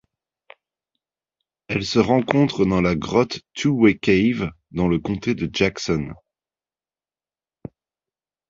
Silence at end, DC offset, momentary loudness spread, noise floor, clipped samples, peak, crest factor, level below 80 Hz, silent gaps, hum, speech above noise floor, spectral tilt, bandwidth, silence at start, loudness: 2.35 s; under 0.1%; 9 LU; under -90 dBFS; under 0.1%; 0 dBFS; 22 dB; -46 dBFS; none; none; over 70 dB; -6 dB/octave; 7.8 kHz; 1.7 s; -20 LUFS